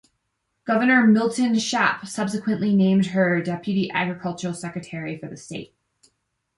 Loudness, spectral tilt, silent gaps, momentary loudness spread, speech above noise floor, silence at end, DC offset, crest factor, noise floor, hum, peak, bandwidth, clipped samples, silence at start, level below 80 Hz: -22 LUFS; -5.5 dB/octave; none; 17 LU; 54 dB; 0.9 s; under 0.1%; 18 dB; -75 dBFS; none; -6 dBFS; 11.5 kHz; under 0.1%; 0.65 s; -64 dBFS